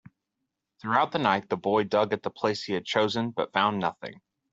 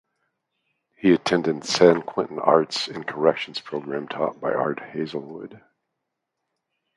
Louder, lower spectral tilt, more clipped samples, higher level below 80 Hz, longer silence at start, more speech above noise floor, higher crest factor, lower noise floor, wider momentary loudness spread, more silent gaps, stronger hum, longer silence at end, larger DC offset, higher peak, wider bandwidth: second, -27 LUFS vs -23 LUFS; about the same, -5.5 dB/octave vs -5 dB/octave; neither; second, -70 dBFS vs -64 dBFS; second, 0.85 s vs 1.05 s; about the same, 56 dB vs 58 dB; about the same, 22 dB vs 24 dB; about the same, -83 dBFS vs -81 dBFS; second, 7 LU vs 13 LU; neither; neither; second, 0.4 s vs 1.4 s; neither; second, -6 dBFS vs 0 dBFS; second, 8 kHz vs 11.5 kHz